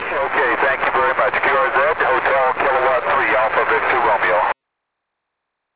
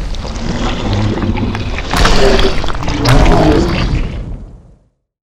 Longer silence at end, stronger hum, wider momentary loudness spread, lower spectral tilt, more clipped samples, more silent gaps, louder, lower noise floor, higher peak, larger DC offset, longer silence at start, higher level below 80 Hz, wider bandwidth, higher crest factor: first, 1.2 s vs 0.75 s; neither; second, 2 LU vs 13 LU; first, -7 dB/octave vs -5.5 dB/octave; neither; neither; about the same, -16 LUFS vs -14 LUFS; first, -78 dBFS vs -49 dBFS; second, -4 dBFS vs 0 dBFS; about the same, 0.5% vs 0.4%; about the same, 0 s vs 0 s; second, -50 dBFS vs -16 dBFS; second, 4 kHz vs 14 kHz; about the same, 14 dB vs 12 dB